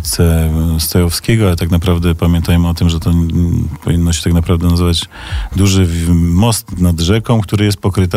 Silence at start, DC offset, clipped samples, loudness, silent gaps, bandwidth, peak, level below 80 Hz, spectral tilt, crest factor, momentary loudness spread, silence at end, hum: 0 s; under 0.1%; under 0.1%; -13 LUFS; none; 16 kHz; -2 dBFS; -22 dBFS; -6 dB/octave; 10 dB; 3 LU; 0 s; none